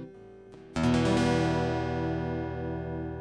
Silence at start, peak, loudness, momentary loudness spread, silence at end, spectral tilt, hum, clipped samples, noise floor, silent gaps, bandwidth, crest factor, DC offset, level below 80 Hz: 0 s; -12 dBFS; -29 LUFS; 15 LU; 0 s; -6.5 dB/octave; none; under 0.1%; -49 dBFS; none; 11 kHz; 16 dB; under 0.1%; -46 dBFS